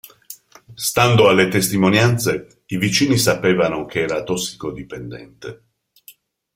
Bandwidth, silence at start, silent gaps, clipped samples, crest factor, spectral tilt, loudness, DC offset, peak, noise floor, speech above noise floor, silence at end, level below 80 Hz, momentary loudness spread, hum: 16.5 kHz; 0.3 s; none; under 0.1%; 18 dB; -4.5 dB/octave; -17 LUFS; under 0.1%; -2 dBFS; -49 dBFS; 31 dB; 1 s; -50 dBFS; 23 LU; none